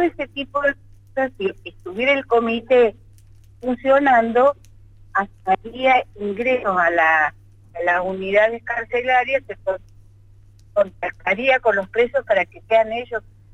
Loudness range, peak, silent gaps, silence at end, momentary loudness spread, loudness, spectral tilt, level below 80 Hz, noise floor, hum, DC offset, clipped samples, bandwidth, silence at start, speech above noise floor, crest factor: 3 LU; -6 dBFS; none; 0.35 s; 11 LU; -19 LUFS; -5.5 dB/octave; -50 dBFS; -48 dBFS; none; under 0.1%; under 0.1%; 8 kHz; 0 s; 28 dB; 14 dB